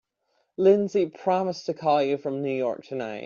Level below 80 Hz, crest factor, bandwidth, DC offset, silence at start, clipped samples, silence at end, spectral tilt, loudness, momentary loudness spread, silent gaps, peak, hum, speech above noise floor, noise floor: -72 dBFS; 18 dB; 7.2 kHz; under 0.1%; 0.6 s; under 0.1%; 0 s; -5.5 dB/octave; -25 LUFS; 10 LU; none; -8 dBFS; none; 48 dB; -73 dBFS